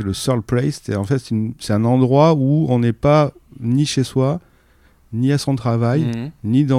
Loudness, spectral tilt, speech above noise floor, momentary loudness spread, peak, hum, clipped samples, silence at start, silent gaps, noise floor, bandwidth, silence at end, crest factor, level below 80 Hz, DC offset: -18 LUFS; -7 dB/octave; 36 dB; 9 LU; -2 dBFS; none; under 0.1%; 0 s; none; -53 dBFS; 14.5 kHz; 0 s; 16 dB; -46 dBFS; under 0.1%